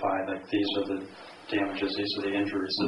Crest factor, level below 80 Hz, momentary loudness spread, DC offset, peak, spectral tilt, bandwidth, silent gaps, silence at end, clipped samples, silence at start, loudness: 14 dB; -68 dBFS; 7 LU; under 0.1%; -16 dBFS; -5.5 dB/octave; 10.5 kHz; none; 0 s; under 0.1%; 0 s; -30 LUFS